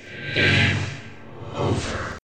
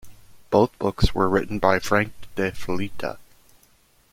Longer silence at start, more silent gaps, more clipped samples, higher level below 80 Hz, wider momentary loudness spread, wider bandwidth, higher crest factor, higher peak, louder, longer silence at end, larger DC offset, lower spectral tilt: about the same, 0 s vs 0.05 s; neither; neither; second, -44 dBFS vs -38 dBFS; first, 21 LU vs 10 LU; second, 9.2 kHz vs 16.5 kHz; about the same, 20 dB vs 22 dB; about the same, -4 dBFS vs -2 dBFS; about the same, -22 LUFS vs -23 LUFS; second, 0 s vs 0.9 s; first, 0.6% vs under 0.1%; about the same, -5 dB/octave vs -6 dB/octave